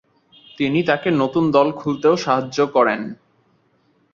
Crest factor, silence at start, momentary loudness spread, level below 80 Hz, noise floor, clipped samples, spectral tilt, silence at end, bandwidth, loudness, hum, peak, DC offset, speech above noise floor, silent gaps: 18 dB; 0.6 s; 5 LU; -60 dBFS; -61 dBFS; under 0.1%; -6 dB/octave; 1 s; 7.4 kHz; -18 LUFS; none; -2 dBFS; under 0.1%; 43 dB; none